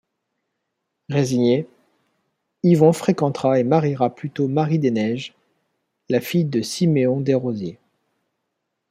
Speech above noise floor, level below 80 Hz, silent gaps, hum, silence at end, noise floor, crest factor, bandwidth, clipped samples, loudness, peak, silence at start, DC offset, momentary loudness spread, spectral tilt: 58 dB; -64 dBFS; none; none; 1.15 s; -77 dBFS; 20 dB; 15.5 kHz; under 0.1%; -20 LUFS; -2 dBFS; 1.1 s; under 0.1%; 10 LU; -7 dB/octave